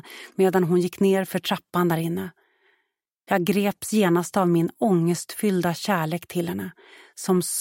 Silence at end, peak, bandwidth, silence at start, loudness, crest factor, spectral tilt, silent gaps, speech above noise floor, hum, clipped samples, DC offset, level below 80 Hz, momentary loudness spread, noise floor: 0 s; -6 dBFS; 17 kHz; 0.05 s; -23 LUFS; 18 dB; -5.5 dB/octave; none; 53 dB; none; under 0.1%; under 0.1%; -68 dBFS; 9 LU; -76 dBFS